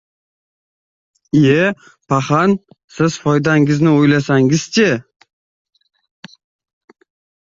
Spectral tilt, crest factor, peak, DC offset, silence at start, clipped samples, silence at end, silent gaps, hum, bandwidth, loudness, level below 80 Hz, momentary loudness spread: -6 dB/octave; 14 dB; -2 dBFS; under 0.1%; 1.35 s; under 0.1%; 2.45 s; 2.84-2.88 s; none; 7.8 kHz; -14 LUFS; -54 dBFS; 7 LU